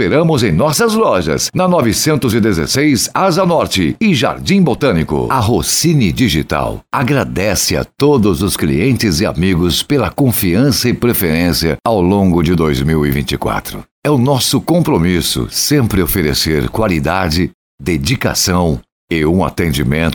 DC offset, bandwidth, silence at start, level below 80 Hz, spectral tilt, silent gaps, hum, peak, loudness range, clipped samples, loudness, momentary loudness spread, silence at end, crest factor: under 0.1%; over 20 kHz; 0 s; -30 dBFS; -5 dB/octave; 13.91-14.02 s, 17.54-17.78 s, 18.92-19.08 s; none; -2 dBFS; 2 LU; under 0.1%; -13 LUFS; 4 LU; 0 s; 12 dB